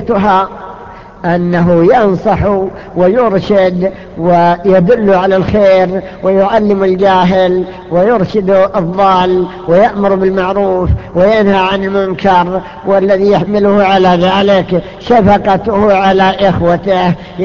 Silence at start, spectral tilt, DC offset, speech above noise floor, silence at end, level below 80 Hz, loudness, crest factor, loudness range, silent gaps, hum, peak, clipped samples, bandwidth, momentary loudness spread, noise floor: 0 s; -8 dB/octave; 0.8%; 21 dB; 0 s; -32 dBFS; -10 LUFS; 10 dB; 2 LU; none; none; 0 dBFS; under 0.1%; 7.2 kHz; 7 LU; -30 dBFS